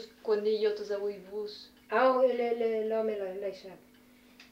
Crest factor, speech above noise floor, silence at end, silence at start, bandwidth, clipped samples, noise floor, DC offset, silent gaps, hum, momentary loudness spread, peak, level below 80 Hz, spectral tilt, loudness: 16 dB; 29 dB; 0.1 s; 0 s; 15.5 kHz; under 0.1%; -59 dBFS; under 0.1%; none; none; 15 LU; -14 dBFS; -74 dBFS; -5 dB/octave; -31 LUFS